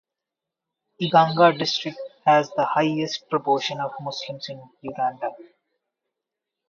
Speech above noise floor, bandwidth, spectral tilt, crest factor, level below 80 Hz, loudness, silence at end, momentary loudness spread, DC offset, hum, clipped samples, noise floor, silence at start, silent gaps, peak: 64 dB; 7.4 kHz; -5 dB/octave; 22 dB; -72 dBFS; -22 LUFS; 1.25 s; 15 LU; under 0.1%; none; under 0.1%; -86 dBFS; 1 s; none; -2 dBFS